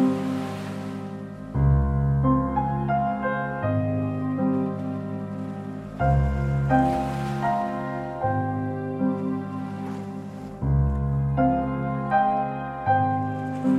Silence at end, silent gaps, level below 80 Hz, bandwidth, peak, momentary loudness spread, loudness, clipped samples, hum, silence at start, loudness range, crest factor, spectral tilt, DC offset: 0 s; none; -34 dBFS; 9 kHz; -8 dBFS; 11 LU; -25 LUFS; under 0.1%; none; 0 s; 3 LU; 16 dB; -9 dB/octave; under 0.1%